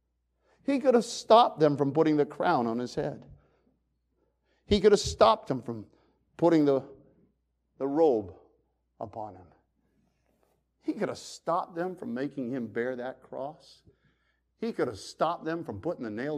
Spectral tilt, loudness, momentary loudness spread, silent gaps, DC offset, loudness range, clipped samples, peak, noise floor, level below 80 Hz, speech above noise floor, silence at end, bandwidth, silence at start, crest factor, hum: -5.5 dB/octave; -28 LUFS; 17 LU; none; under 0.1%; 11 LU; under 0.1%; -6 dBFS; -75 dBFS; -56 dBFS; 47 dB; 0 s; 12.5 kHz; 0.7 s; 22 dB; none